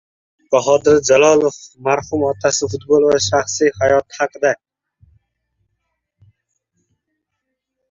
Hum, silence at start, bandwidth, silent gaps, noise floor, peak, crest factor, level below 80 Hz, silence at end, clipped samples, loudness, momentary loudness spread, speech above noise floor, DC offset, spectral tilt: none; 0.5 s; 7.8 kHz; none; -76 dBFS; 0 dBFS; 18 dB; -50 dBFS; 3.35 s; under 0.1%; -15 LUFS; 9 LU; 62 dB; under 0.1%; -3.5 dB/octave